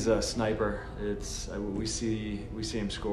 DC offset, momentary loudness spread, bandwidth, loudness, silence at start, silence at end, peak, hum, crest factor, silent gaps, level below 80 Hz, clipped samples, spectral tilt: under 0.1%; 7 LU; 13.5 kHz; -33 LUFS; 0 s; 0 s; -14 dBFS; none; 18 dB; none; -42 dBFS; under 0.1%; -4.5 dB/octave